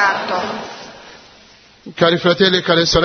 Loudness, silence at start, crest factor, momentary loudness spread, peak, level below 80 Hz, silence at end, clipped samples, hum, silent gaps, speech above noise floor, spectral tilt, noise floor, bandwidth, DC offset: -15 LUFS; 0 s; 16 dB; 21 LU; 0 dBFS; -40 dBFS; 0 s; under 0.1%; none; none; 31 dB; -4 dB/octave; -46 dBFS; 6.6 kHz; under 0.1%